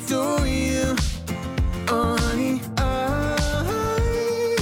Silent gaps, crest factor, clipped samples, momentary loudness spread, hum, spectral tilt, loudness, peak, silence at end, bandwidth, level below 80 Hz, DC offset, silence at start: none; 14 dB; under 0.1%; 4 LU; none; -5 dB/octave; -23 LUFS; -8 dBFS; 0 s; 17.5 kHz; -30 dBFS; under 0.1%; 0 s